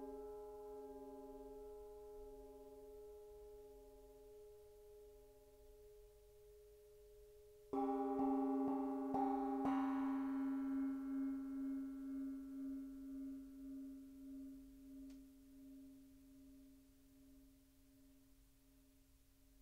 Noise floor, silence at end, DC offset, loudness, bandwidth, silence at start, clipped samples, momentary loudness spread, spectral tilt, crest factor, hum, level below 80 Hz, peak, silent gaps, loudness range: -70 dBFS; 0.05 s; under 0.1%; -45 LUFS; 16 kHz; 0 s; under 0.1%; 24 LU; -7 dB/octave; 18 dB; none; -70 dBFS; -30 dBFS; none; 22 LU